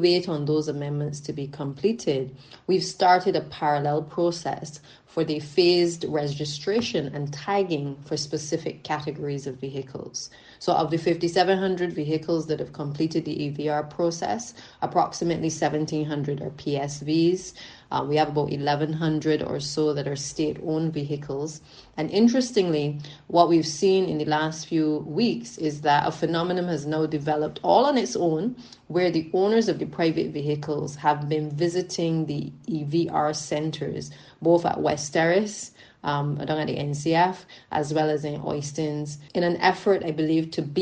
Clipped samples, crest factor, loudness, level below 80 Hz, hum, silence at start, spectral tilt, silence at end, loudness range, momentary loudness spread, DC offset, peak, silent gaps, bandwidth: under 0.1%; 22 dB; -25 LUFS; -62 dBFS; none; 0 s; -5.5 dB/octave; 0 s; 4 LU; 11 LU; under 0.1%; -4 dBFS; none; 9.6 kHz